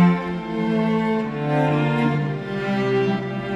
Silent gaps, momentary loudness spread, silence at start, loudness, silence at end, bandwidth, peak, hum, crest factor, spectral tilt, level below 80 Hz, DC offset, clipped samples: none; 6 LU; 0 s; -22 LUFS; 0 s; 8.2 kHz; -6 dBFS; none; 14 dB; -8.5 dB/octave; -52 dBFS; under 0.1%; under 0.1%